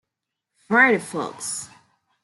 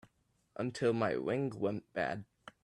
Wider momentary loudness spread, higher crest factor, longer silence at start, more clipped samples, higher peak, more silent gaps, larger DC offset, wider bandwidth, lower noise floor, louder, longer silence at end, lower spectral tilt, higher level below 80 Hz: about the same, 15 LU vs 13 LU; about the same, 20 dB vs 18 dB; first, 0.7 s vs 0.55 s; neither; first, -4 dBFS vs -18 dBFS; neither; neither; about the same, 12 kHz vs 11 kHz; first, -83 dBFS vs -75 dBFS; first, -21 LUFS vs -36 LUFS; first, 0.6 s vs 0.15 s; second, -3.5 dB/octave vs -6.5 dB/octave; about the same, -74 dBFS vs -72 dBFS